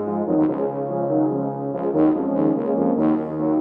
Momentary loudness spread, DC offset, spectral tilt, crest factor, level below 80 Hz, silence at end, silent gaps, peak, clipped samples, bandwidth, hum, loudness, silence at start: 5 LU; under 0.1%; -12 dB/octave; 14 dB; -56 dBFS; 0 s; none; -6 dBFS; under 0.1%; 3.2 kHz; none; -21 LUFS; 0 s